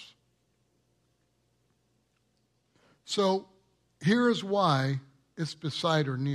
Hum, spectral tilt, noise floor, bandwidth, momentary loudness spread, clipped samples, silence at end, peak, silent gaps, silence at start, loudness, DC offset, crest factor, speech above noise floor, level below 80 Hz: none; -6 dB/octave; -73 dBFS; 12.5 kHz; 10 LU; under 0.1%; 0 s; -10 dBFS; none; 0 s; -29 LUFS; under 0.1%; 22 dB; 46 dB; -74 dBFS